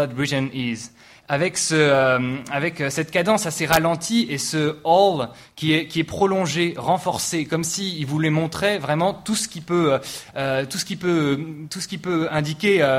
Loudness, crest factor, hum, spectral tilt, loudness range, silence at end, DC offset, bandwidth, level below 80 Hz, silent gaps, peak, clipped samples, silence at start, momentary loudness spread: -21 LUFS; 20 dB; none; -4.5 dB/octave; 3 LU; 0 s; under 0.1%; 16 kHz; -54 dBFS; none; 0 dBFS; under 0.1%; 0 s; 9 LU